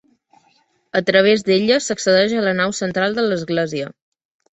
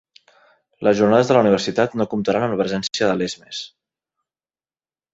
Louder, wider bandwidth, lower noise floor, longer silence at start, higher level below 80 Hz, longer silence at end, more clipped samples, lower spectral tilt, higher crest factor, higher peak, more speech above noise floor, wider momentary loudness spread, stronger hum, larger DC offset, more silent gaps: about the same, -17 LUFS vs -19 LUFS; about the same, 8.2 kHz vs 8 kHz; second, -60 dBFS vs under -90 dBFS; first, 0.95 s vs 0.8 s; about the same, -60 dBFS vs -58 dBFS; second, 0.6 s vs 1.45 s; neither; second, -4 dB/octave vs -5.5 dB/octave; about the same, 18 dB vs 18 dB; about the same, -2 dBFS vs -2 dBFS; second, 43 dB vs over 72 dB; second, 9 LU vs 15 LU; neither; neither; neither